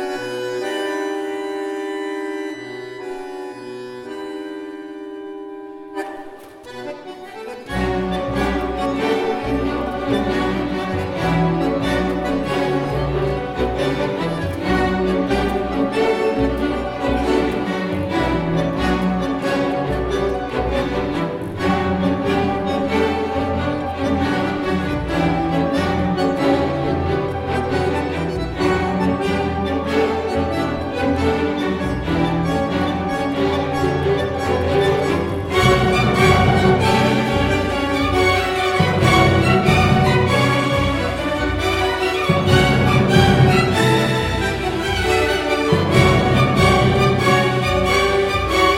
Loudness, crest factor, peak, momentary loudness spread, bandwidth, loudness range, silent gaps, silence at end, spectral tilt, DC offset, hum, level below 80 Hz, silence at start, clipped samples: -18 LUFS; 18 dB; 0 dBFS; 15 LU; 16.5 kHz; 11 LU; none; 0 s; -6 dB/octave; under 0.1%; none; -34 dBFS; 0 s; under 0.1%